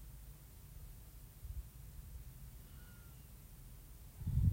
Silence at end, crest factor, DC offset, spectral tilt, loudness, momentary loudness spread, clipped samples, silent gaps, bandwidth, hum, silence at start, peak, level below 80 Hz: 0 s; 24 dB; under 0.1%; -7 dB/octave; -50 LUFS; 9 LU; under 0.1%; none; 16 kHz; none; 0 s; -20 dBFS; -50 dBFS